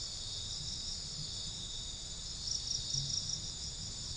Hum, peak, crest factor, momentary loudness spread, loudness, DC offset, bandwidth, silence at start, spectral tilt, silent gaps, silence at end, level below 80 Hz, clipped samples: none; -24 dBFS; 18 dB; 6 LU; -38 LUFS; under 0.1%; 10.5 kHz; 0 s; -1.5 dB/octave; none; 0 s; -52 dBFS; under 0.1%